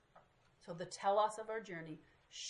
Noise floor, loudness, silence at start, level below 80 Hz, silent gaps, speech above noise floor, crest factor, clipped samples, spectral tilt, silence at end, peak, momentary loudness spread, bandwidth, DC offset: -68 dBFS; -40 LUFS; 0.15 s; -80 dBFS; none; 28 dB; 20 dB; under 0.1%; -3.5 dB/octave; 0 s; -22 dBFS; 20 LU; 11 kHz; under 0.1%